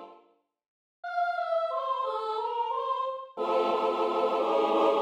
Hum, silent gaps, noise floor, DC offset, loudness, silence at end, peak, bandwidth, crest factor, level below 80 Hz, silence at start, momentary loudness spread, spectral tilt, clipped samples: none; 0.68-1.03 s; -64 dBFS; under 0.1%; -29 LUFS; 0 s; -12 dBFS; 9.4 kHz; 18 dB; -80 dBFS; 0 s; 7 LU; -4.5 dB/octave; under 0.1%